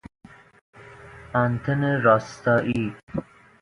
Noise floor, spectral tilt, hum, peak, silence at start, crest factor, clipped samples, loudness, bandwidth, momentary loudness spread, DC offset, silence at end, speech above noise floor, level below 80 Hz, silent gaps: -45 dBFS; -7.5 dB/octave; none; -4 dBFS; 0.8 s; 20 dB; under 0.1%; -23 LUFS; 11 kHz; 15 LU; under 0.1%; 0.4 s; 22 dB; -54 dBFS; 3.03-3.07 s